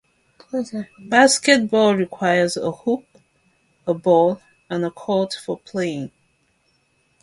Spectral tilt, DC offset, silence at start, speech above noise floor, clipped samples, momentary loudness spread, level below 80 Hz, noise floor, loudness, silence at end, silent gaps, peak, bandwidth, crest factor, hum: -4 dB/octave; under 0.1%; 0.55 s; 45 dB; under 0.1%; 15 LU; -64 dBFS; -64 dBFS; -19 LUFS; 1.15 s; none; 0 dBFS; 11.5 kHz; 20 dB; none